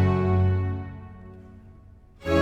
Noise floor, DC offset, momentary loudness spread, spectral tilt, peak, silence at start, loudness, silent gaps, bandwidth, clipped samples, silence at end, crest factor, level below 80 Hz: -50 dBFS; under 0.1%; 23 LU; -8.5 dB/octave; -8 dBFS; 0 s; -25 LUFS; none; 6.4 kHz; under 0.1%; 0 s; 18 dB; -44 dBFS